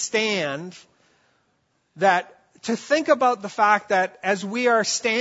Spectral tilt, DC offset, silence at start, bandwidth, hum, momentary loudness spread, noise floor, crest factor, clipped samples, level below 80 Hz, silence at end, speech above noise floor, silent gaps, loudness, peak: -3 dB/octave; under 0.1%; 0 s; 8 kHz; none; 9 LU; -69 dBFS; 18 dB; under 0.1%; -76 dBFS; 0 s; 47 dB; none; -21 LUFS; -4 dBFS